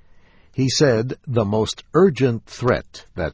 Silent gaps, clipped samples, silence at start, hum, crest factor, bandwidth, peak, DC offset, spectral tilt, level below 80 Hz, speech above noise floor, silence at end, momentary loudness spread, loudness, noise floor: none; under 0.1%; 0.55 s; none; 18 dB; 8 kHz; -2 dBFS; under 0.1%; -5.5 dB/octave; -44 dBFS; 30 dB; 0 s; 9 LU; -20 LUFS; -49 dBFS